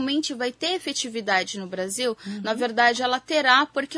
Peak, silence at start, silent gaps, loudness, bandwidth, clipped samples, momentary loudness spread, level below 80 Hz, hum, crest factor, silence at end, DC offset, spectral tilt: -2 dBFS; 0 s; none; -23 LUFS; 11 kHz; under 0.1%; 10 LU; -70 dBFS; none; 22 dB; 0 s; under 0.1%; -2 dB/octave